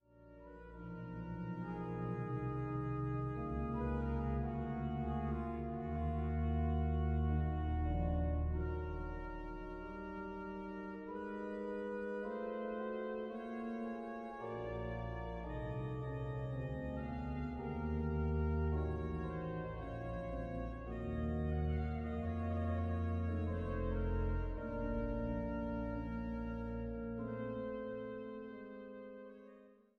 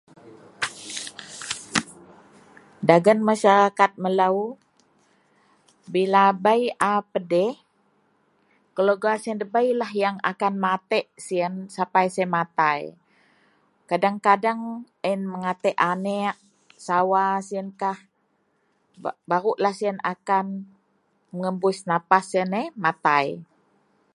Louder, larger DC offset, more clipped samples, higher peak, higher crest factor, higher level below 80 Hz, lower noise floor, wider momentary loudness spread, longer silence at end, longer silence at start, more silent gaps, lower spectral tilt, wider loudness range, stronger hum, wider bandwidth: second, -41 LUFS vs -23 LUFS; neither; neither; second, -26 dBFS vs 0 dBFS; second, 14 dB vs 24 dB; first, -46 dBFS vs -72 dBFS; second, -62 dBFS vs -69 dBFS; second, 10 LU vs 15 LU; second, 0.25 s vs 0.7 s; about the same, 0.15 s vs 0.25 s; neither; first, -10 dB/octave vs -5 dB/octave; about the same, 6 LU vs 5 LU; neither; second, 4.4 kHz vs 11.5 kHz